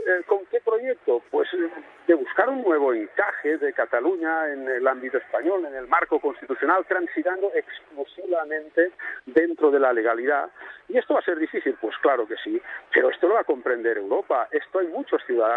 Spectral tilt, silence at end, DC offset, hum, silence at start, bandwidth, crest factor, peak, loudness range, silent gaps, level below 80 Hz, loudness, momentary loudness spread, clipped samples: -6 dB/octave; 0 s; under 0.1%; none; 0 s; 4.1 kHz; 18 dB; -6 dBFS; 2 LU; none; -72 dBFS; -24 LUFS; 7 LU; under 0.1%